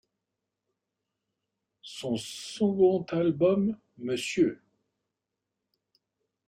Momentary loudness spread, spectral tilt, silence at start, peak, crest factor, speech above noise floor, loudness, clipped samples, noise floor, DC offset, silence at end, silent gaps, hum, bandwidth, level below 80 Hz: 14 LU; -6 dB/octave; 1.85 s; -12 dBFS; 18 dB; 59 dB; -28 LUFS; under 0.1%; -86 dBFS; under 0.1%; 1.9 s; none; none; 14 kHz; -68 dBFS